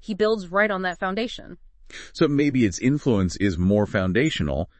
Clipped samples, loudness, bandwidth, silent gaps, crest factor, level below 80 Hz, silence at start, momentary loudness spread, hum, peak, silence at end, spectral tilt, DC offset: under 0.1%; -22 LUFS; 8.8 kHz; none; 16 dB; -44 dBFS; 0.1 s; 10 LU; none; -6 dBFS; 0.15 s; -6 dB/octave; under 0.1%